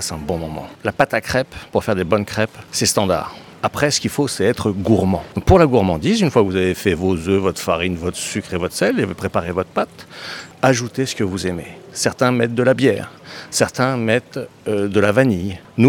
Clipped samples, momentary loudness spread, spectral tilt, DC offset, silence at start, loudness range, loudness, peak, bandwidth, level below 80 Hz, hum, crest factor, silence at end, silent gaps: under 0.1%; 10 LU; -5 dB/octave; under 0.1%; 0 s; 4 LU; -18 LUFS; 0 dBFS; 18 kHz; -42 dBFS; none; 18 dB; 0 s; none